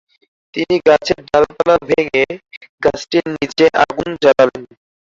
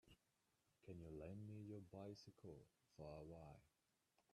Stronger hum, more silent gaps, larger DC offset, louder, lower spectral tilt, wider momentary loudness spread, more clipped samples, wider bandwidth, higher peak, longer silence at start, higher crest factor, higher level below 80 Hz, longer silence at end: neither; first, 2.57-2.61 s, 2.69-2.78 s vs none; neither; first, -15 LUFS vs -59 LUFS; second, -5 dB/octave vs -7.5 dB/octave; about the same, 9 LU vs 7 LU; neither; second, 7.6 kHz vs 12.5 kHz; first, -2 dBFS vs -44 dBFS; first, 0.55 s vs 0.05 s; about the same, 14 dB vs 16 dB; first, -46 dBFS vs -78 dBFS; first, 0.35 s vs 0.15 s